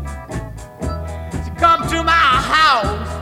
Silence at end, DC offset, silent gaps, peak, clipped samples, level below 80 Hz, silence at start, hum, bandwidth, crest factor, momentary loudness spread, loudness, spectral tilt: 0 s; under 0.1%; none; -2 dBFS; under 0.1%; -30 dBFS; 0 s; none; 16 kHz; 16 dB; 16 LU; -14 LUFS; -4 dB/octave